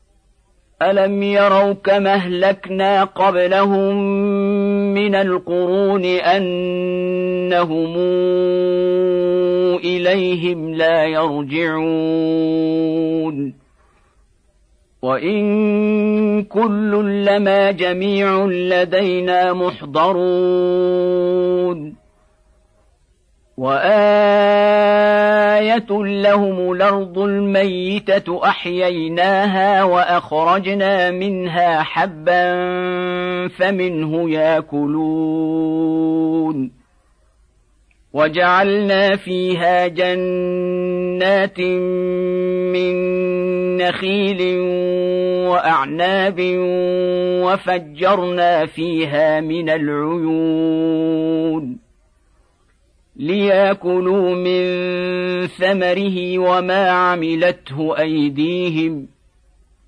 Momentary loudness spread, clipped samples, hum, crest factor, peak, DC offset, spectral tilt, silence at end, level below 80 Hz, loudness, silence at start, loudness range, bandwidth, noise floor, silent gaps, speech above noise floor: 6 LU; under 0.1%; none; 14 dB; -2 dBFS; under 0.1%; -7.5 dB/octave; 0.8 s; -56 dBFS; -16 LUFS; 0.8 s; 4 LU; 9.4 kHz; -57 dBFS; none; 41 dB